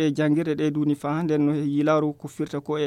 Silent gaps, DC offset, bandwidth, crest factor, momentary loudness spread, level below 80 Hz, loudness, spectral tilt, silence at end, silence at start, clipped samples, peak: none; under 0.1%; 11 kHz; 12 dB; 8 LU; -66 dBFS; -24 LUFS; -7.5 dB/octave; 0 s; 0 s; under 0.1%; -10 dBFS